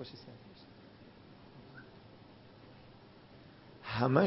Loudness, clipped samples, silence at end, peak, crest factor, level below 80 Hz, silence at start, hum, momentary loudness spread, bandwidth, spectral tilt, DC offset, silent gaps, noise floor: -39 LUFS; under 0.1%; 0 s; -12 dBFS; 26 dB; -68 dBFS; 0 s; none; 16 LU; 5.6 kHz; -6 dB/octave; under 0.1%; none; -57 dBFS